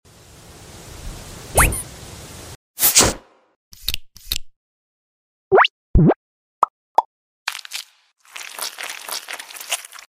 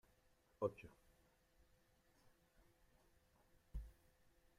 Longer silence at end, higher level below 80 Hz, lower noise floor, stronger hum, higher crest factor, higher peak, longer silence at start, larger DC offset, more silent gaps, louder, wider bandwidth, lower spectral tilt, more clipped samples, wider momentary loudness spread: second, 0.25 s vs 0.7 s; first, -32 dBFS vs -64 dBFS; second, -45 dBFS vs -77 dBFS; neither; second, 22 dB vs 28 dB; first, 0 dBFS vs -28 dBFS; about the same, 0.6 s vs 0.6 s; neither; first, 2.55-2.74 s, 3.56-3.71 s, 4.56-5.51 s, 5.70-5.94 s, 6.16-6.62 s, 6.70-6.95 s, 7.05-7.46 s vs none; first, -19 LUFS vs -50 LUFS; about the same, 16 kHz vs 15.5 kHz; second, -3 dB/octave vs -7.5 dB/octave; neither; first, 22 LU vs 18 LU